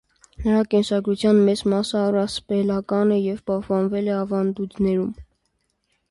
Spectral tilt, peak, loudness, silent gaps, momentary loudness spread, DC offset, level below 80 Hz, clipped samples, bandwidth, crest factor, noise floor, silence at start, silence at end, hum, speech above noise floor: -6.5 dB/octave; -6 dBFS; -21 LUFS; none; 7 LU; under 0.1%; -48 dBFS; under 0.1%; 11.5 kHz; 14 dB; -71 dBFS; 0.4 s; 0.9 s; none; 51 dB